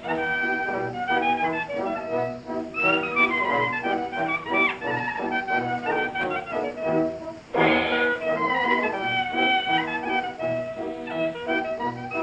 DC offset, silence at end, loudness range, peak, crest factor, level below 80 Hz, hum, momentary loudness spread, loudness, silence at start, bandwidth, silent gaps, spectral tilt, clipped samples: under 0.1%; 0 s; 2 LU; -6 dBFS; 18 dB; -58 dBFS; none; 8 LU; -24 LUFS; 0 s; 9 kHz; none; -5.5 dB/octave; under 0.1%